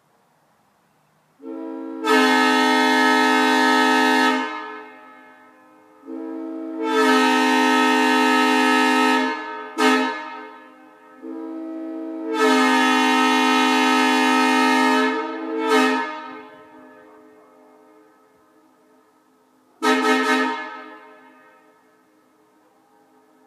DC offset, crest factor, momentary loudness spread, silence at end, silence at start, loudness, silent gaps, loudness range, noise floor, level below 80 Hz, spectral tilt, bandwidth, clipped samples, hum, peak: under 0.1%; 18 dB; 18 LU; 2.5 s; 1.45 s; -18 LUFS; none; 9 LU; -61 dBFS; -88 dBFS; -1.5 dB/octave; 15 kHz; under 0.1%; none; -4 dBFS